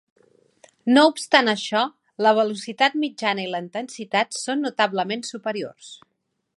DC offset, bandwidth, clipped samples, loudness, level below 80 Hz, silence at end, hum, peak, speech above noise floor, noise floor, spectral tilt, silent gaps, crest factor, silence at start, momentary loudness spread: under 0.1%; 11.5 kHz; under 0.1%; -22 LUFS; -76 dBFS; 0.6 s; none; 0 dBFS; 34 dB; -56 dBFS; -3.5 dB/octave; none; 22 dB; 0.85 s; 15 LU